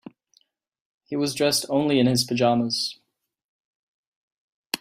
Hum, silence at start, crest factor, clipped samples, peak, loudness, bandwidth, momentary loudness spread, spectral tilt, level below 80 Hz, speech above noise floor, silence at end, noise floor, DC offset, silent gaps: none; 1.1 s; 20 dB; under 0.1%; -6 dBFS; -23 LUFS; 16 kHz; 10 LU; -4.5 dB/octave; -64 dBFS; 43 dB; 0.05 s; -65 dBFS; under 0.1%; 3.44-4.70 s